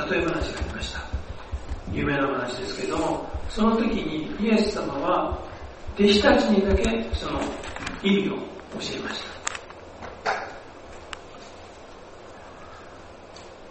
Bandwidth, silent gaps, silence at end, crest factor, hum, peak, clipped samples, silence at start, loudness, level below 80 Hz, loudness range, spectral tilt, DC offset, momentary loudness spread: 8.8 kHz; none; 0 s; 22 dB; none; -4 dBFS; under 0.1%; 0 s; -25 LUFS; -38 dBFS; 14 LU; -5 dB/octave; under 0.1%; 22 LU